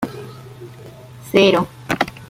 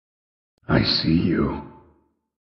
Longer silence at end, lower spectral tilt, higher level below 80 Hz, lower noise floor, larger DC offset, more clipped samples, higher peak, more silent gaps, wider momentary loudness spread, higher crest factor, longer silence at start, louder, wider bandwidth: second, 0.05 s vs 0.75 s; about the same, -5 dB/octave vs -4.5 dB/octave; second, -52 dBFS vs -42 dBFS; second, -39 dBFS vs -62 dBFS; neither; neither; first, 0 dBFS vs -6 dBFS; neither; first, 25 LU vs 8 LU; about the same, 20 dB vs 18 dB; second, 0 s vs 0.7 s; first, -17 LUFS vs -21 LUFS; first, 16 kHz vs 6.2 kHz